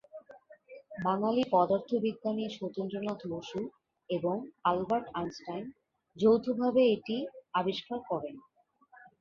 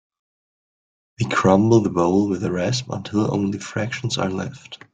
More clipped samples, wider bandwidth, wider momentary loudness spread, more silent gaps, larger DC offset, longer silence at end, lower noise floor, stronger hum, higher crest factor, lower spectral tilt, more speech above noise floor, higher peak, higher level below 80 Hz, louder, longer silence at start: neither; second, 7.2 kHz vs 9.4 kHz; first, 14 LU vs 11 LU; neither; neither; about the same, 0.15 s vs 0.2 s; second, -62 dBFS vs under -90 dBFS; neither; about the same, 20 dB vs 18 dB; about the same, -7 dB/octave vs -6 dB/octave; second, 32 dB vs over 70 dB; second, -14 dBFS vs -2 dBFS; second, -70 dBFS vs -54 dBFS; second, -32 LUFS vs -21 LUFS; second, 0.15 s vs 1.2 s